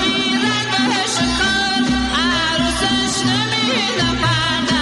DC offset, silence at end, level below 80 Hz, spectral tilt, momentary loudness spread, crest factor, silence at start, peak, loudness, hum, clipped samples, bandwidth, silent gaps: under 0.1%; 0 s; -34 dBFS; -3 dB/octave; 1 LU; 10 dB; 0 s; -8 dBFS; -16 LUFS; none; under 0.1%; 12 kHz; none